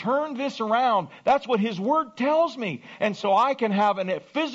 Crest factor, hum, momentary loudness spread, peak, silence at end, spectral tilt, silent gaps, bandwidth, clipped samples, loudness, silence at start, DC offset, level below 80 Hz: 14 dB; none; 6 LU; -10 dBFS; 0 s; -3.5 dB/octave; none; 8 kHz; under 0.1%; -24 LUFS; 0 s; under 0.1%; -70 dBFS